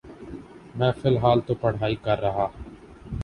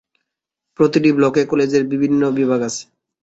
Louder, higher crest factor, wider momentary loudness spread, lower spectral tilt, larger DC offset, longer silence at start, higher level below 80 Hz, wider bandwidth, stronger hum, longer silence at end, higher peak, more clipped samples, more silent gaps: second, -24 LUFS vs -16 LUFS; about the same, 20 dB vs 16 dB; first, 20 LU vs 6 LU; first, -8.5 dB/octave vs -6 dB/octave; neither; second, 0.05 s vs 0.8 s; first, -44 dBFS vs -58 dBFS; first, 10 kHz vs 8 kHz; neither; second, 0 s vs 0.4 s; about the same, -4 dBFS vs -2 dBFS; neither; neither